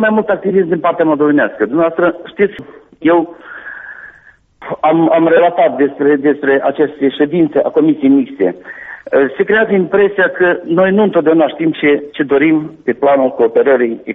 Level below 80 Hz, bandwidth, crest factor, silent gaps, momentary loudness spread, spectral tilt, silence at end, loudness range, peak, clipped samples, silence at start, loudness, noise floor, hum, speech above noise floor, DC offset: -54 dBFS; 3.9 kHz; 12 dB; none; 13 LU; -5 dB/octave; 0 s; 3 LU; 0 dBFS; under 0.1%; 0 s; -12 LUFS; -45 dBFS; none; 33 dB; under 0.1%